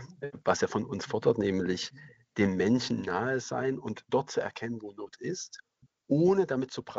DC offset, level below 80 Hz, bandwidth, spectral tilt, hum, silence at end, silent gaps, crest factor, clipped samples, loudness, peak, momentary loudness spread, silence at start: under 0.1%; -66 dBFS; 8 kHz; -5.5 dB/octave; none; 0 s; none; 22 dB; under 0.1%; -30 LUFS; -10 dBFS; 14 LU; 0 s